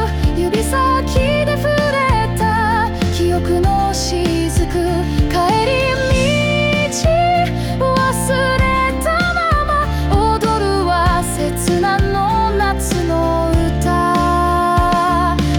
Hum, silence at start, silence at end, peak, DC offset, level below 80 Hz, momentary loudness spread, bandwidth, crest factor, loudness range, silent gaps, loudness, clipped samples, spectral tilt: none; 0 s; 0 s; -4 dBFS; under 0.1%; -24 dBFS; 3 LU; 19.5 kHz; 10 dB; 1 LU; none; -15 LUFS; under 0.1%; -5.5 dB/octave